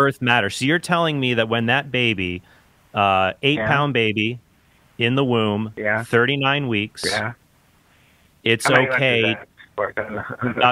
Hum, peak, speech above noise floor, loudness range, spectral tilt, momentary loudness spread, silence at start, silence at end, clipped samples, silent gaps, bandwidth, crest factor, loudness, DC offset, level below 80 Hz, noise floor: none; 0 dBFS; 37 dB; 2 LU; -5 dB/octave; 10 LU; 0 s; 0 s; under 0.1%; none; 16 kHz; 20 dB; -20 LUFS; under 0.1%; -56 dBFS; -57 dBFS